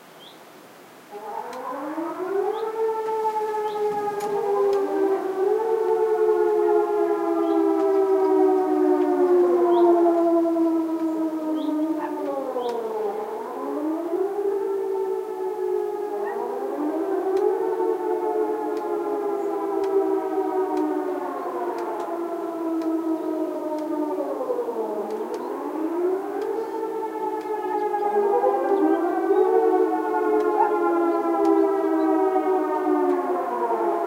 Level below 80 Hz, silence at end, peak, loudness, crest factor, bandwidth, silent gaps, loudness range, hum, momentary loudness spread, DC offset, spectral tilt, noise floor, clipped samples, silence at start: -80 dBFS; 0 s; -8 dBFS; -23 LUFS; 16 dB; 16 kHz; none; 7 LU; none; 9 LU; under 0.1%; -5.5 dB/octave; -46 dBFS; under 0.1%; 0.05 s